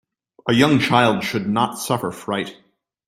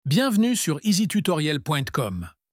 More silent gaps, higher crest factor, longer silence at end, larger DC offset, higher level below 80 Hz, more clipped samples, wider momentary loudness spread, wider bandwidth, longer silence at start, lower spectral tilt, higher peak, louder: neither; first, 20 dB vs 14 dB; first, 0.55 s vs 0.25 s; neither; about the same, -56 dBFS vs -54 dBFS; neither; first, 11 LU vs 7 LU; about the same, 16.5 kHz vs 16.5 kHz; first, 0.45 s vs 0.05 s; about the same, -5 dB/octave vs -5 dB/octave; first, 0 dBFS vs -10 dBFS; first, -19 LUFS vs -23 LUFS